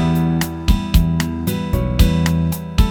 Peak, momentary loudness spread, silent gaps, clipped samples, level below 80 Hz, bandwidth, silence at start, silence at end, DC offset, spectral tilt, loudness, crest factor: 0 dBFS; 5 LU; none; under 0.1%; -20 dBFS; 18.5 kHz; 0 s; 0 s; under 0.1%; -6 dB/octave; -18 LUFS; 16 dB